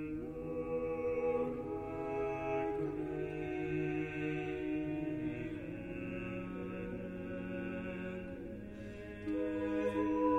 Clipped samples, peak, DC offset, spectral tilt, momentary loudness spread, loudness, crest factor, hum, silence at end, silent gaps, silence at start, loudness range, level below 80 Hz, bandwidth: under 0.1%; -22 dBFS; under 0.1%; -8.5 dB/octave; 8 LU; -39 LUFS; 16 dB; none; 0 s; none; 0 s; 5 LU; -58 dBFS; 8.6 kHz